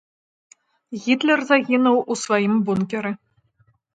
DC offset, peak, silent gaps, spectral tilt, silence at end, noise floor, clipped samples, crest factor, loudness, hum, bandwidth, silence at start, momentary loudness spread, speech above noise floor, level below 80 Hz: under 0.1%; -2 dBFS; none; -5 dB/octave; 0.8 s; -62 dBFS; under 0.1%; 20 dB; -20 LUFS; none; 9.2 kHz; 0.9 s; 12 LU; 43 dB; -66 dBFS